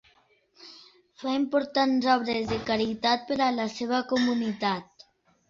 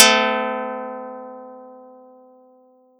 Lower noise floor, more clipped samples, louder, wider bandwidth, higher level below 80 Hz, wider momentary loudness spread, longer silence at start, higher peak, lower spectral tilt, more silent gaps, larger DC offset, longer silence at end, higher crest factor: first, -64 dBFS vs -54 dBFS; neither; second, -27 LUFS vs -20 LUFS; second, 7.6 kHz vs 17 kHz; first, -60 dBFS vs under -90 dBFS; second, 10 LU vs 24 LU; first, 0.6 s vs 0 s; second, -10 dBFS vs 0 dBFS; first, -5 dB/octave vs -0.5 dB/octave; neither; neither; second, 0.65 s vs 1.15 s; about the same, 18 dB vs 22 dB